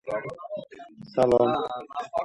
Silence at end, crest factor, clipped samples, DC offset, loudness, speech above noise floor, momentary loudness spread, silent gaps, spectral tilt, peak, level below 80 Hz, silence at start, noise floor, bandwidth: 0 s; 18 dB; under 0.1%; under 0.1%; -26 LUFS; 21 dB; 19 LU; none; -7 dB/octave; -8 dBFS; -58 dBFS; 0.05 s; -45 dBFS; 11.5 kHz